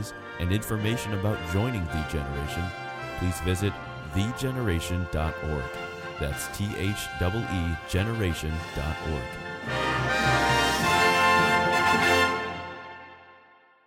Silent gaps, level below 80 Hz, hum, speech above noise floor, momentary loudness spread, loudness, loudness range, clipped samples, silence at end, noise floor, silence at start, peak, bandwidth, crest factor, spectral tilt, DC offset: none; -40 dBFS; none; 28 dB; 14 LU; -26 LUFS; 8 LU; under 0.1%; 0.5 s; -57 dBFS; 0 s; -8 dBFS; 16.5 kHz; 18 dB; -4.5 dB/octave; under 0.1%